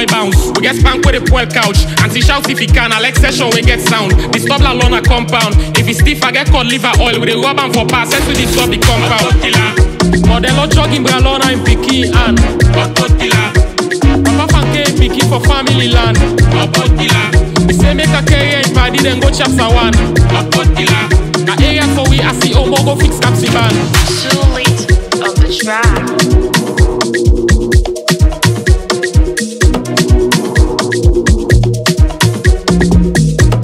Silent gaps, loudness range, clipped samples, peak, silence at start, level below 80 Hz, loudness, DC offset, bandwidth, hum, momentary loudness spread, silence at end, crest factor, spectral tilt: none; 2 LU; 0.3%; 0 dBFS; 0 s; -14 dBFS; -10 LUFS; under 0.1%; 16 kHz; none; 2 LU; 0 s; 10 dB; -4.5 dB/octave